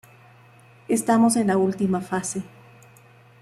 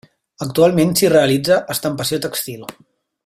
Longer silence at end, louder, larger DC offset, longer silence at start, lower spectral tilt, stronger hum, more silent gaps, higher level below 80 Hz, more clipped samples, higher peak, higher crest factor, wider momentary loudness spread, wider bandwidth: first, 0.95 s vs 0.55 s; second, -22 LUFS vs -16 LUFS; neither; first, 0.9 s vs 0.4 s; about the same, -5.5 dB/octave vs -4.5 dB/octave; neither; neither; second, -64 dBFS vs -54 dBFS; neither; second, -8 dBFS vs -2 dBFS; about the same, 16 dB vs 16 dB; second, 12 LU vs 15 LU; second, 14.5 kHz vs 16 kHz